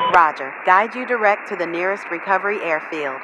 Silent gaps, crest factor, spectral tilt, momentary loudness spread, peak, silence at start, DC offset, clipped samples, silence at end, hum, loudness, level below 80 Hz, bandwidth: none; 20 dB; -4.5 dB/octave; 8 LU; 0 dBFS; 0 s; under 0.1%; under 0.1%; 0 s; none; -19 LUFS; -62 dBFS; 10.5 kHz